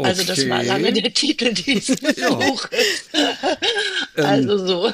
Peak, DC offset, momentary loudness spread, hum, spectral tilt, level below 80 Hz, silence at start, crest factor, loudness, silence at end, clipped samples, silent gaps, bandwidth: -4 dBFS; under 0.1%; 2 LU; none; -3.5 dB/octave; -60 dBFS; 0 s; 14 dB; -18 LUFS; 0 s; under 0.1%; none; 15.5 kHz